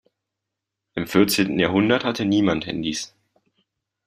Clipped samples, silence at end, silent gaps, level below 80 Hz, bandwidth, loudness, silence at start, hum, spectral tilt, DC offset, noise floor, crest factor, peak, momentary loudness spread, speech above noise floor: under 0.1%; 1 s; none; -56 dBFS; 15.5 kHz; -21 LUFS; 0.95 s; none; -5 dB/octave; under 0.1%; -83 dBFS; 20 dB; -4 dBFS; 12 LU; 63 dB